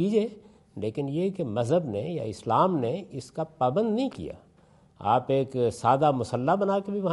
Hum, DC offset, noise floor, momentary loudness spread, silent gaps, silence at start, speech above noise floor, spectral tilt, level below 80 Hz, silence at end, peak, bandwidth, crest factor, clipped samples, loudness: none; under 0.1%; -58 dBFS; 11 LU; none; 0 s; 32 dB; -7.5 dB/octave; -64 dBFS; 0 s; -8 dBFS; 11.5 kHz; 18 dB; under 0.1%; -27 LUFS